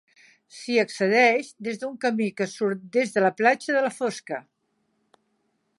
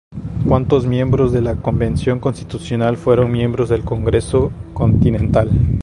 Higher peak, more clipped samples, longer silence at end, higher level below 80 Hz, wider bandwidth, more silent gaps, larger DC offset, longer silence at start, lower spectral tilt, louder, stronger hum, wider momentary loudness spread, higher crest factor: second, -6 dBFS vs 0 dBFS; neither; first, 1.4 s vs 0 s; second, -80 dBFS vs -28 dBFS; about the same, 11.5 kHz vs 11 kHz; neither; neither; first, 0.55 s vs 0.1 s; second, -4.5 dB/octave vs -8.5 dB/octave; second, -24 LUFS vs -16 LUFS; neither; first, 14 LU vs 7 LU; about the same, 20 dB vs 16 dB